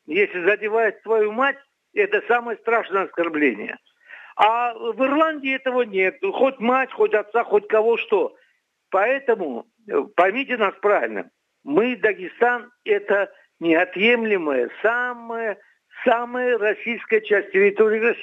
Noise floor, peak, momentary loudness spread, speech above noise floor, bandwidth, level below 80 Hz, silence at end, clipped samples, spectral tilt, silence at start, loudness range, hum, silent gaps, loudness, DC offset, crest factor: -65 dBFS; -2 dBFS; 9 LU; 44 dB; 5.6 kHz; -82 dBFS; 0 s; under 0.1%; -6.5 dB/octave; 0.1 s; 2 LU; none; none; -21 LUFS; under 0.1%; 18 dB